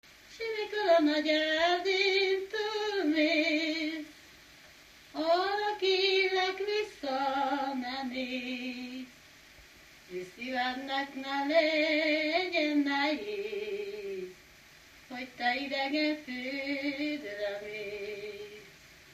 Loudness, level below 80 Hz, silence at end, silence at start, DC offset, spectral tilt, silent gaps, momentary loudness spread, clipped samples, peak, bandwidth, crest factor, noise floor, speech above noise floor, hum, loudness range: -30 LUFS; -70 dBFS; 0 s; 0.25 s; under 0.1%; -3 dB/octave; none; 16 LU; under 0.1%; -14 dBFS; 15 kHz; 18 dB; -56 dBFS; 27 dB; none; 7 LU